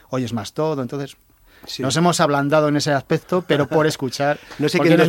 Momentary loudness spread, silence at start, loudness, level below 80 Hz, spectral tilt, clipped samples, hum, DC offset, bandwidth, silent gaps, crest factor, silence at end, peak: 9 LU; 0.1 s; -19 LUFS; -56 dBFS; -5.5 dB/octave; under 0.1%; none; under 0.1%; 17 kHz; none; 16 dB; 0 s; -2 dBFS